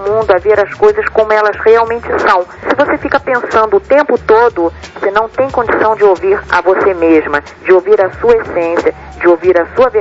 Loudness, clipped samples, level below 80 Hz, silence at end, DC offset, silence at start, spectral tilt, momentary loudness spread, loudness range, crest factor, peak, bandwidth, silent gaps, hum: -11 LUFS; 0.1%; -38 dBFS; 0 s; under 0.1%; 0 s; -6 dB/octave; 5 LU; 1 LU; 10 dB; 0 dBFS; 7.8 kHz; none; none